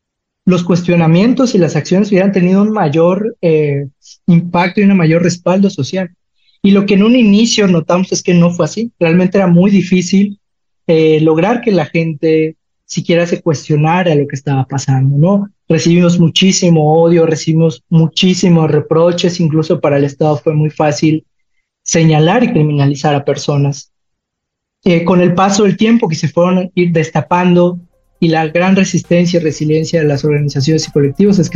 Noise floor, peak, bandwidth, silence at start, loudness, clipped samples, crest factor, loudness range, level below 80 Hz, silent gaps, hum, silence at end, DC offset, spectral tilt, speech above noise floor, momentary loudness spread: -76 dBFS; 0 dBFS; 7.6 kHz; 0.45 s; -11 LUFS; under 0.1%; 10 dB; 3 LU; -48 dBFS; none; none; 0 s; under 0.1%; -6 dB/octave; 65 dB; 7 LU